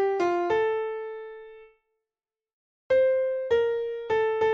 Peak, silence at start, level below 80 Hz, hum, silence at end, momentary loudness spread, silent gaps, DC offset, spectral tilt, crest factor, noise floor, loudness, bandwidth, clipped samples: -14 dBFS; 0 s; -64 dBFS; none; 0 s; 15 LU; 2.53-2.90 s; under 0.1%; -5.5 dB/octave; 12 dB; under -90 dBFS; -26 LUFS; 7.2 kHz; under 0.1%